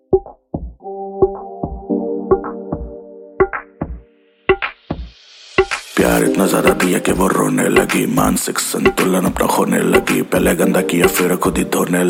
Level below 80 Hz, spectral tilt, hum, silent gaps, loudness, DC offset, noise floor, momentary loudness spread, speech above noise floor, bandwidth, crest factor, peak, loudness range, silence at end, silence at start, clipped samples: -36 dBFS; -4.5 dB/octave; none; none; -16 LUFS; under 0.1%; -49 dBFS; 15 LU; 34 dB; 17 kHz; 16 dB; 0 dBFS; 7 LU; 0 s; 0.1 s; under 0.1%